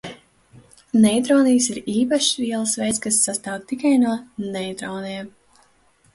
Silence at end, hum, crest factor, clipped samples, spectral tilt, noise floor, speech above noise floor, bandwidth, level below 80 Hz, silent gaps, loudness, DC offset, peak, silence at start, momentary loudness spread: 0.85 s; none; 16 dB; under 0.1%; -3.5 dB/octave; -58 dBFS; 38 dB; 11.5 kHz; -60 dBFS; none; -20 LUFS; under 0.1%; -6 dBFS; 0.05 s; 13 LU